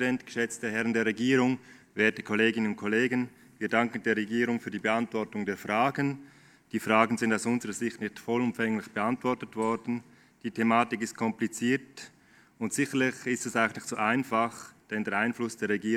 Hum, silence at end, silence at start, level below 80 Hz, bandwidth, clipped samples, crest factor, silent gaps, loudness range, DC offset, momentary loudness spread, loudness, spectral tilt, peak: none; 0 s; 0 s; -74 dBFS; 15.5 kHz; under 0.1%; 24 dB; none; 3 LU; under 0.1%; 11 LU; -29 LUFS; -5 dB/octave; -6 dBFS